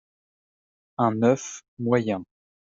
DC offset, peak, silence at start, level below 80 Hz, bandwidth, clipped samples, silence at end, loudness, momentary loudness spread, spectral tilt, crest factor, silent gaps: under 0.1%; -8 dBFS; 1 s; -70 dBFS; 7.8 kHz; under 0.1%; 0.5 s; -25 LUFS; 13 LU; -6.5 dB/octave; 20 dB; 1.68-1.77 s